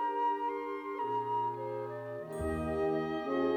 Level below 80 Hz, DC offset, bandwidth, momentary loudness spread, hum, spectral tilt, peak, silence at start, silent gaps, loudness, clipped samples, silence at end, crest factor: -54 dBFS; under 0.1%; 13 kHz; 7 LU; none; -7 dB/octave; -22 dBFS; 0 s; none; -35 LUFS; under 0.1%; 0 s; 14 dB